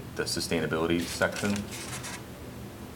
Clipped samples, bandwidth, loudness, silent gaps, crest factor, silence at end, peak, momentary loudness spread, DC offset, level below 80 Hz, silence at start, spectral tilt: under 0.1%; 18 kHz; -30 LUFS; none; 20 dB; 0 s; -12 dBFS; 14 LU; under 0.1%; -52 dBFS; 0 s; -4 dB/octave